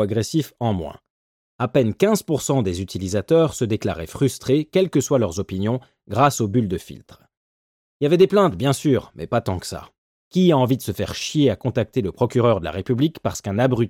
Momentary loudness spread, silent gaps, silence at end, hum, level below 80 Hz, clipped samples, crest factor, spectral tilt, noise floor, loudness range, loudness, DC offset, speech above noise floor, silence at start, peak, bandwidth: 10 LU; 1.10-1.59 s, 7.37-8.00 s, 9.98-10.31 s; 0 s; none; -50 dBFS; under 0.1%; 16 dB; -6 dB/octave; under -90 dBFS; 2 LU; -21 LUFS; under 0.1%; over 70 dB; 0 s; -4 dBFS; 16.5 kHz